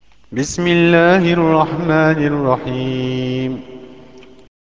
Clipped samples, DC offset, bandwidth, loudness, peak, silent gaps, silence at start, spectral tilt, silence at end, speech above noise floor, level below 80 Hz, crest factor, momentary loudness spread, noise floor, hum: under 0.1%; 0.6%; 8 kHz; -15 LUFS; 0 dBFS; none; 0.3 s; -6 dB/octave; 0.6 s; 27 dB; -46 dBFS; 16 dB; 13 LU; -41 dBFS; none